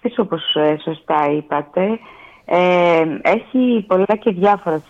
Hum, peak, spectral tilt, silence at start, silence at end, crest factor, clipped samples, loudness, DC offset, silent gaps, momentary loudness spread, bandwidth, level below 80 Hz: none; -4 dBFS; -7 dB/octave; 0.05 s; 0.1 s; 12 dB; under 0.1%; -17 LUFS; under 0.1%; none; 7 LU; 7.6 kHz; -58 dBFS